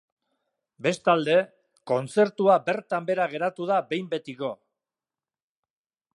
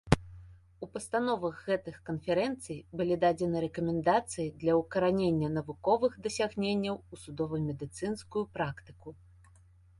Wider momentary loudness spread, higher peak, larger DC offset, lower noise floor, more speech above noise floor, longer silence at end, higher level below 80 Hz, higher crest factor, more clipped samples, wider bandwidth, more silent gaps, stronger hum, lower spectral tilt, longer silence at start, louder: about the same, 12 LU vs 13 LU; second, -8 dBFS vs -4 dBFS; neither; first, under -90 dBFS vs -60 dBFS; first, over 66 dB vs 28 dB; first, 1.6 s vs 0.85 s; second, -78 dBFS vs -52 dBFS; second, 20 dB vs 28 dB; neither; about the same, 11.5 kHz vs 11.5 kHz; neither; neither; about the same, -5.5 dB/octave vs -6 dB/octave; first, 0.8 s vs 0.05 s; first, -25 LUFS vs -32 LUFS